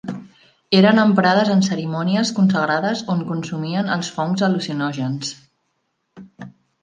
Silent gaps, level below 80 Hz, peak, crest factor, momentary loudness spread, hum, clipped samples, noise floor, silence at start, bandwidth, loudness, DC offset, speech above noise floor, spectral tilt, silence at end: none; -64 dBFS; -2 dBFS; 18 dB; 13 LU; none; under 0.1%; -71 dBFS; 0.05 s; 9.4 kHz; -19 LUFS; under 0.1%; 53 dB; -5.5 dB/octave; 0.35 s